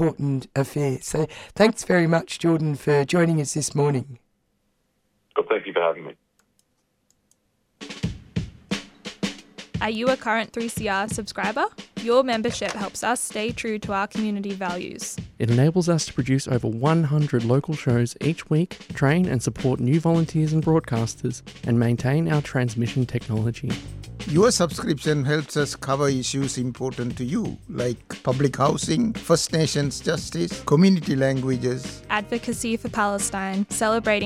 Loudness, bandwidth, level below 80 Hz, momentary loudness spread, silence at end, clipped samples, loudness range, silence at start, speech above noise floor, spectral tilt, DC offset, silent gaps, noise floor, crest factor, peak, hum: -23 LUFS; 15 kHz; -50 dBFS; 11 LU; 0 s; under 0.1%; 8 LU; 0 s; 48 dB; -5.5 dB/octave; under 0.1%; none; -70 dBFS; 20 dB; -4 dBFS; none